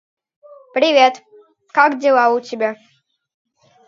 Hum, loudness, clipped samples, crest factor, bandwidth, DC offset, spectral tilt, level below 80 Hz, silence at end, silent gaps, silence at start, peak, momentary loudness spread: none; -16 LUFS; under 0.1%; 18 dB; 7.4 kHz; under 0.1%; -3 dB/octave; -76 dBFS; 1.15 s; none; 0.75 s; 0 dBFS; 12 LU